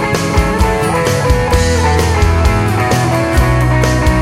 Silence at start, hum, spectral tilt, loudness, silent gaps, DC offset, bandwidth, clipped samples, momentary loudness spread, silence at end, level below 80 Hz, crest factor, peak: 0 s; none; -5.5 dB/octave; -12 LUFS; none; under 0.1%; 16 kHz; under 0.1%; 2 LU; 0 s; -18 dBFS; 10 dB; 0 dBFS